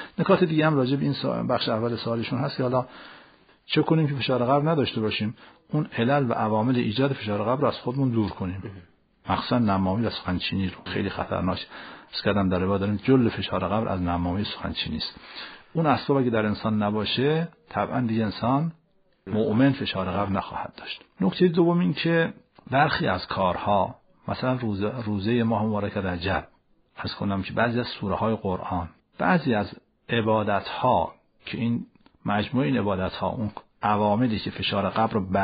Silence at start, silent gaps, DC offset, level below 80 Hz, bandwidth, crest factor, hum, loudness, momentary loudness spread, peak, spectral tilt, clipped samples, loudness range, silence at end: 0 s; none; under 0.1%; -52 dBFS; 5 kHz; 18 dB; none; -25 LUFS; 11 LU; -6 dBFS; -5 dB/octave; under 0.1%; 3 LU; 0 s